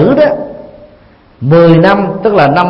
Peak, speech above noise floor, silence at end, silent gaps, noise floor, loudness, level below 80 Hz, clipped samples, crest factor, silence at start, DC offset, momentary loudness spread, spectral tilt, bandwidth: 0 dBFS; 34 dB; 0 s; none; -41 dBFS; -8 LUFS; -38 dBFS; 0.4%; 8 dB; 0 s; under 0.1%; 14 LU; -9 dB/octave; 5.8 kHz